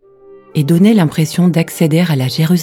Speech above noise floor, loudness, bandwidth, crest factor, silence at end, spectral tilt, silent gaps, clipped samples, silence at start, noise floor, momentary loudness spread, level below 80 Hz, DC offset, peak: 29 dB; -13 LUFS; 17 kHz; 12 dB; 0 s; -6.5 dB/octave; none; under 0.1%; 0.3 s; -41 dBFS; 5 LU; -56 dBFS; under 0.1%; 0 dBFS